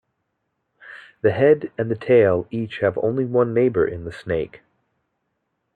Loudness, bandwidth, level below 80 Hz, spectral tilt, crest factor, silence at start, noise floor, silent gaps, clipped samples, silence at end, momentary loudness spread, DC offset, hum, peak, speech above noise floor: -20 LUFS; 4.8 kHz; -56 dBFS; -9 dB/octave; 18 dB; 0.85 s; -75 dBFS; none; under 0.1%; 1.2 s; 13 LU; under 0.1%; none; -4 dBFS; 55 dB